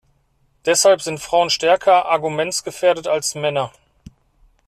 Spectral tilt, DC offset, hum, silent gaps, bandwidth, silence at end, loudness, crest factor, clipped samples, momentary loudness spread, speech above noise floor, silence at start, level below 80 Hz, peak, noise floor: -2.5 dB/octave; under 0.1%; none; none; 14 kHz; 1 s; -17 LUFS; 16 dB; under 0.1%; 8 LU; 44 dB; 0.65 s; -56 dBFS; -2 dBFS; -62 dBFS